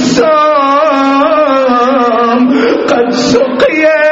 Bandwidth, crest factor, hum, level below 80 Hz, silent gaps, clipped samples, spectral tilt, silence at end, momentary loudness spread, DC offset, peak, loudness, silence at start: 7.8 kHz; 8 dB; none; -46 dBFS; none; 0.2%; -4.5 dB/octave; 0 s; 2 LU; under 0.1%; 0 dBFS; -8 LUFS; 0 s